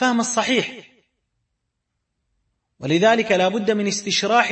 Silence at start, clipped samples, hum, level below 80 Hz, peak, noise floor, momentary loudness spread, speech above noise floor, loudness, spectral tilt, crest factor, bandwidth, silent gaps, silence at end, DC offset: 0 s; under 0.1%; none; -66 dBFS; -2 dBFS; -77 dBFS; 6 LU; 58 dB; -19 LUFS; -3.5 dB/octave; 20 dB; 8.8 kHz; none; 0 s; under 0.1%